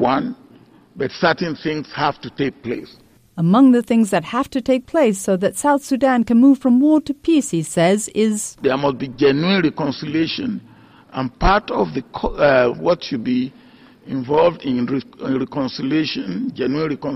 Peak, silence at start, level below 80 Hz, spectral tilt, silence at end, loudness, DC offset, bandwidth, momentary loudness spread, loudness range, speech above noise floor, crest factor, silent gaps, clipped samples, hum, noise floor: -4 dBFS; 0 s; -38 dBFS; -5.5 dB/octave; 0 s; -18 LUFS; under 0.1%; 15.5 kHz; 12 LU; 5 LU; 30 dB; 14 dB; none; under 0.1%; none; -48 dBFS